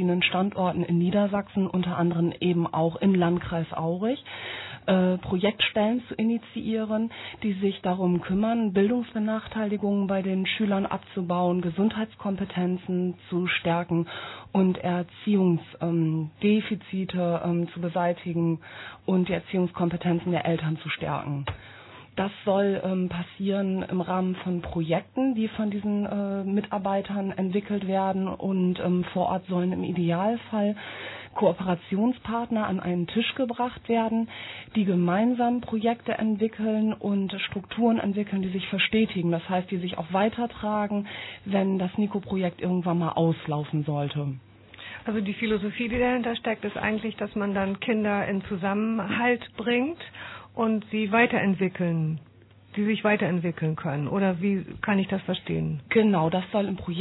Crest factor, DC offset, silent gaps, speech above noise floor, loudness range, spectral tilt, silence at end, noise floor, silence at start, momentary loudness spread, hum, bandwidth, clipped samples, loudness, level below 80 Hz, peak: 18 dB; under 0.1%; none; 25 dB; 2 LU; -10.5 dB/octave; 0 s; -51 dBFS; 0 s; 7 LU; none; 4.1 kHz; under 0.1%; -27 LUFS; -56 dBFS; -8 dBFS